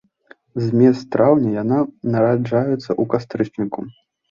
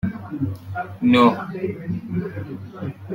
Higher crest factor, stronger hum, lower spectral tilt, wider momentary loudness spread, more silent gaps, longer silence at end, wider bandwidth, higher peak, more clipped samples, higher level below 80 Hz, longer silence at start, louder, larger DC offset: about the same, 16 dB vs 20 dB; neither; about the same, -9 dB/octave vs -8 dB/octave; second, 11 LU vs 17 LU; neither; first, 0.4 s vs 0 s; second, 7.2 kHz vs 9 kHz; about the same, -2 dBFS vs -2 dBFS; neither; about the same, -58 dBFS vs -54 dBFS; first, 0.55 s vs 0.05 s; first, -18 LUFS vs -22 LUFS; neither